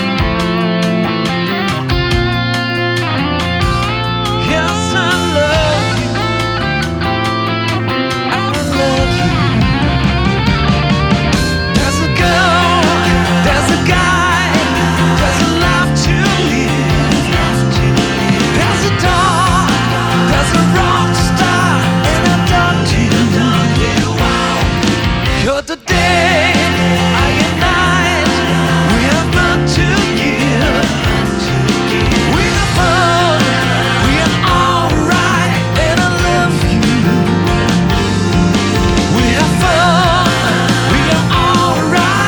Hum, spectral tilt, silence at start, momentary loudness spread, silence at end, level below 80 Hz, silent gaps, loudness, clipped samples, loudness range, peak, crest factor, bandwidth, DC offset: none; -5 dB/octave; 0 s; 4 LU; 0 s; -24 dBFS; none; -12 LUFS; under 0.1%; 3 LU; 0 dBFS; 12 dB; over 20 kHz; under 0.1%